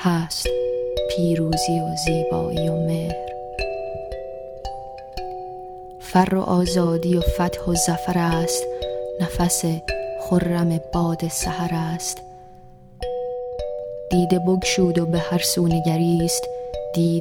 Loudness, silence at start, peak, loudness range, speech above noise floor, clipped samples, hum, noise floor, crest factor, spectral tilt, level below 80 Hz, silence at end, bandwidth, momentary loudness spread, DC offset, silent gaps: -22 LUFS; 0 s; -4 dBFS; 6 LU; 24 dB; under 0.1%; none; -44 dBFS; 18 dB; -5 dB/octave; -38 dBFS; 0 s; 18.5 kHz; 14 LU; under 0.1%; none